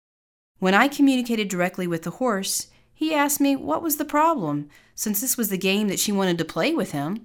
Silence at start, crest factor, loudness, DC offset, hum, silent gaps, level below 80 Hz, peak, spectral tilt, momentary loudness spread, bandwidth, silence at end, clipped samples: 0.6 s; 20 dB; -23 LUFS; under 0.1%; none; none; -62 dBFS; -4 dBFS; -4 dB/octave; 9 LU; over 20 kHz; 0.05 s; under 0.1%